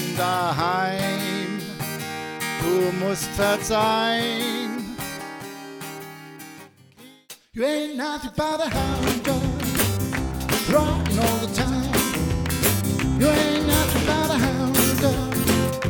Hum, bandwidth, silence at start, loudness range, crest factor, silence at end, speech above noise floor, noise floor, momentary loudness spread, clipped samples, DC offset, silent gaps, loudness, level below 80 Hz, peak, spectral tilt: none; over 20 kHz; 0 s; 10 LU; 20 dB; 0 s; 27 dB; -49 dBFS; 14 LU; under 0.1%; under 0.1%; none; -22 LUFS; -36 dBFS; -4 dBFS; -4.5 dB/octave